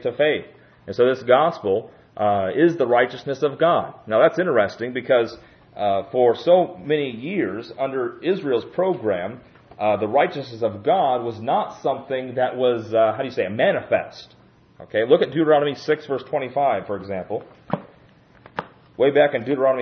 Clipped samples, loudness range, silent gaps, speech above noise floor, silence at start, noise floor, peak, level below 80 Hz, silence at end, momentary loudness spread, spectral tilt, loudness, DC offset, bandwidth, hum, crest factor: under 0.1%; 4 LU; none; 31 dB; 0 s; -52 dBFS; -2 dBFS; -64 dBFS; 0 s; 11 LU; -7 dB/octave; -21 LUFS; under 0.1%; 6.6 kHz; none; 20 dB